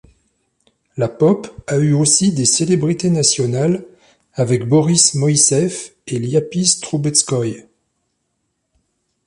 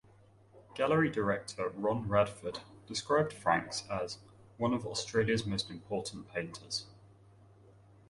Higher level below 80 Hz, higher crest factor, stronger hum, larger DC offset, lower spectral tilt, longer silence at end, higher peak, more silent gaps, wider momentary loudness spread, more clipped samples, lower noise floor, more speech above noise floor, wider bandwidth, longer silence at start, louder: first, -54 dBFS vs -62 dBFS; about the same, 18 dB vs 22 dB; neither; neither; about the same, -4.5 dB/octave vs -5 dB/octave; first, 1.65 s vs 1.05 s; first, 0 dBFS vs -14 dBFS; neither; about the same, 12 LU vs 11 LU; neither; first, -71 dBFS vs -61 dBFS; first, 55 dB vs 28 dB; about the same, 11.5 kHz vs 11.5 kHz; first, 0.95 s vs 0.55 s; first, -15 LUFS vs -34 LUFS